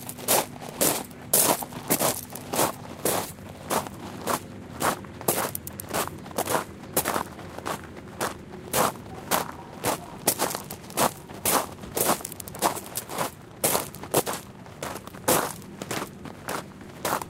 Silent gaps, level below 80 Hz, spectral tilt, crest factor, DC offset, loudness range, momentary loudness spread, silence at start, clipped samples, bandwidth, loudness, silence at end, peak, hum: none; -56 dBFS; -2.5 dB/octave; 26 dB; under 0.1%; 4 LU; 12 LU; 0 s; under 0.1%; 16.5 kHz; -27 LUFS; 0 s; -4 dBFS; none